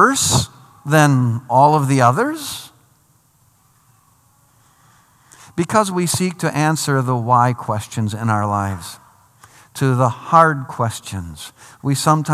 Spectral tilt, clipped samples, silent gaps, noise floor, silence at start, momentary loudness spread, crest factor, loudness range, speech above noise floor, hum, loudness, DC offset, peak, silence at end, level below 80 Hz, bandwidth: -5 dB/octave; under 0.1%; none; -56 dBFS; 0 s; 16 LU; 18 dB; 7 LU; 40 dB; none; -17 LUFS; under 0.1%; 0 dBFS; 0 s; -54 dBFS; 15 kHz